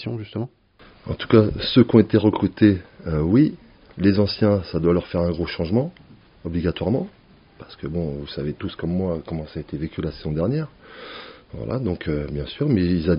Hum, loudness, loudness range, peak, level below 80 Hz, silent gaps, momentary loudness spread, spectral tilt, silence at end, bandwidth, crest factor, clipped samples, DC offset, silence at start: none; -22 LUFS; 9 LU; 0 dBFS; -42 dBFS; none; 18 LU; -7 dB/octave; 0 s; 5.4 kHz; 20 dB; under 0.1%; under 0.1%; 0 s